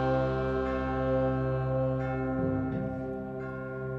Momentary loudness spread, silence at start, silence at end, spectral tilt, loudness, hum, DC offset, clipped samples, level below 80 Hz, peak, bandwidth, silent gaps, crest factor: 9 LU; 0 s; 0 s; -9.5 dB/octave; -31 LUFS; none; under 0.1%; under 0.1%; -44 dBFS; -18 dBFS; 5.8 kHz; none; 12 dB